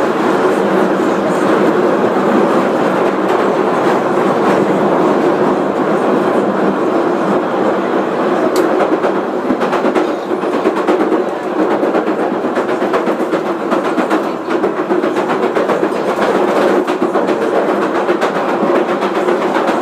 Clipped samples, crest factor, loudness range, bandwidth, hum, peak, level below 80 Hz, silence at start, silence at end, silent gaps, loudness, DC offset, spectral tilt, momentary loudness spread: under 0.1%; 12 dB; 2 LU; 14.5 kHz; none; 0 dBFS; -60 dBFS; 0 s; 0 s; none; -14 LUFS; under 0.1%; -6 dB/octave; 4 LU